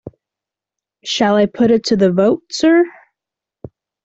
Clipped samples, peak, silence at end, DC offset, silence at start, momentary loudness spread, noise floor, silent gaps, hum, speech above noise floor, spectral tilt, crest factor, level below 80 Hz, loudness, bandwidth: under 0.1%; -2 dBFS; 0.4 s; under 0.1%; 0.05 s; 8 LU; -86 dBFS; none; none; 73 dB; -5.5 dB/octave; 14 dB; -54 dBFS; -14 LUFS; 8 kHz